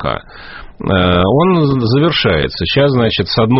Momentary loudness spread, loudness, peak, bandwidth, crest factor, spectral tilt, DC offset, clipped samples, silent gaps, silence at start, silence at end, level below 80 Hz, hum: 13 LU; -12 LUFS; 0 dBFS; 6 kHz; 12 dB; -4.5 dB/octave; under 0.1%; under 0.1%; none; 0 s; 0 s; -34 dBFS; none